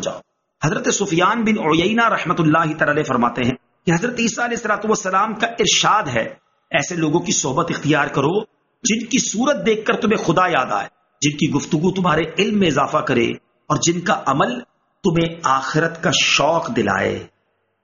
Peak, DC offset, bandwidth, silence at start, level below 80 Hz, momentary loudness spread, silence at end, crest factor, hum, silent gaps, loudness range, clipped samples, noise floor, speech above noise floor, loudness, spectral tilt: -2 dBFS; under 0.1%; 7.4 kHz; 0 s; -52 dBFS; 7 LU; 0.6 s; 16 dB; none; none; 2 LU; under 0.1%; -67 dBFS; 49 dB; -18 LUFS; -3.5 dB/octave